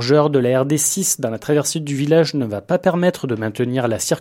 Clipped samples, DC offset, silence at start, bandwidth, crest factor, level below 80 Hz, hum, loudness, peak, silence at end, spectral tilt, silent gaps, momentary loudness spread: under 0.1%; under 0.1%; 0 s; 16.5 kHz; 16 dB; -58 dBFS; none; -18 LUFS; -2 dBFS; 0 s; -4.5 dB/octave; none; 6 LU